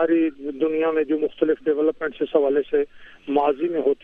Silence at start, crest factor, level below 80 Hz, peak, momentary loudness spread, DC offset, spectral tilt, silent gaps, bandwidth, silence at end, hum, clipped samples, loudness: 0 s; 16 dB; -58 dBFS; -6 dBFS; 5 LU; under 0.1%; -8 dB/octave; none; 3.8 kHz; 0.1 s; none; under 0.1%; -22 LUFS